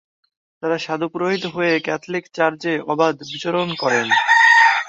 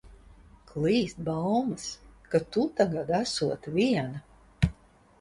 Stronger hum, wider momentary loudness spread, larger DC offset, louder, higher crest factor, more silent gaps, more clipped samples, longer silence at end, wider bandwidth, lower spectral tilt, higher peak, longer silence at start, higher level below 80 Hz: neither; about the same, 13 LU vs 11 LU; neither; first, -18 LUFS vs -29 LUFS; about the same, 16 dB vs 20 dB; neither; neither; second, 0 s vs 0.5 s; second, 7.8 kHz vs 11.5 kHz; second, -4 dB/octave vs -6 dB/octave; first, -2 dBFS vs -10 dBFS; first, 0.65 s vs 0.05 s; second, -66 dBFS vs -46 dBFS